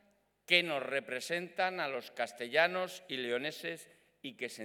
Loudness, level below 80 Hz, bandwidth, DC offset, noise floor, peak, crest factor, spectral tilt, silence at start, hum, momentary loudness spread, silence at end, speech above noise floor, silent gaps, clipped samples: -34 LUFS; -90 dBFS; 19 kHz; under 0.1%; -61 dBFS; -10 dBFS; 26 dB; -3 dB/octave; 0.5 s; none; 14 LU; 0 s; 26 dB; none; under 0.1%